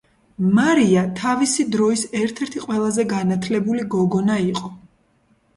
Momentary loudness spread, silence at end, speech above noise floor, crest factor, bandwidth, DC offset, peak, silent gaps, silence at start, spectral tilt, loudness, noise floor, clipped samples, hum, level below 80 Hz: 8 LU; 0.8 s; 42 dB; 14 dB; 11.5 kHz; under 0.1%; -6 dBFS; none; 0.4 s; -5.5 dB/octave; -20 LUFS; -61 dBFS; under 0.1%; none; -56 dBFS